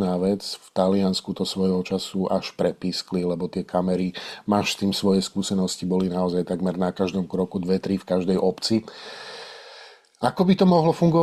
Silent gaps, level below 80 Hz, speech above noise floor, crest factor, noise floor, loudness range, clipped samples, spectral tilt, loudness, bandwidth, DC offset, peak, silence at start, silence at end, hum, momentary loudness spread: none; -60 dBFS; 24 dB; 18 dB; -47 dBFS; 2 LU; under 0.1%; -6 dB/octave; -24 LUFS; 13 kHz; under 0.1%; -6 dBFS; 0 s; 0 s; none; 9 LU